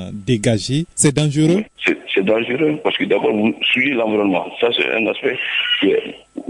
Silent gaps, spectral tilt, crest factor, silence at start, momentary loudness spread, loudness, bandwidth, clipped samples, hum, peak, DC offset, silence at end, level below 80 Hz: none; -4.5 dB/octave; 16 dB; 0 s; 4 LU; -17 LUFS; 11 kHz; under 0.1%; none; -2 dBFS; under 0.1%; 0.05 s; -52 dBFS